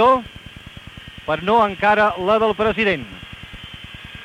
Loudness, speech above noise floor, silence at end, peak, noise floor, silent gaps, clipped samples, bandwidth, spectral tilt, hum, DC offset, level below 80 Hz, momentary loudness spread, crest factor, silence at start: -18 LUFS; 21 dB; 0 s; -4 dBFS; -39 dBFS; none; under 0.1%; 14 kHz; -6 dB/octave; none; under 0.1%; -46 dBFS; 22 LU; 16 dB; 0 s